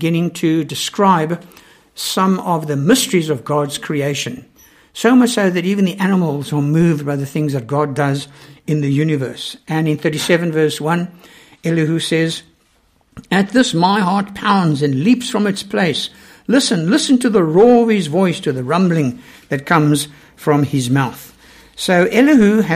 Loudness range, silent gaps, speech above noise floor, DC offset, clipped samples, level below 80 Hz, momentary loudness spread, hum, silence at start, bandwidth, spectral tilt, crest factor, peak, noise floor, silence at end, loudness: 4 LU; none; 42 dB; under 0.1%; under 0.1%; -54 dBFS; 11 LU; none; 0 s; 15.5 kHz; -5.5 dB/octave; 16 dB; 0 dBFS; -57 dBFS; 0 s; -16 LUFS